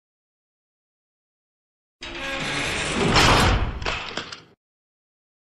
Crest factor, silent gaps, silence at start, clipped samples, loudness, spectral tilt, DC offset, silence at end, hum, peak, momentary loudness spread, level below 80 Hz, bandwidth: 22 dB; none; 2 s; under 0.1%; -21 LUFS; -3.5 dB/octave; under 0.1%; 1.05 s; none; -4 dBFS; 20 LU; -34 dBFS; 13.5 kHz